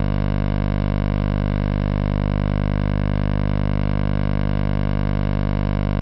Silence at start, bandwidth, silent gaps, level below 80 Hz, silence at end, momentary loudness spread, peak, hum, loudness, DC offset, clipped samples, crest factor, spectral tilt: 0 s; 5.8 kHz; none; -24 dBFS; 0 s; 0 LU; -10 dBFS; 50 Hz at -20 dBFS; -22 LUFS; under 0.1%; under 0.1%; 10 dB; -8 dB/octave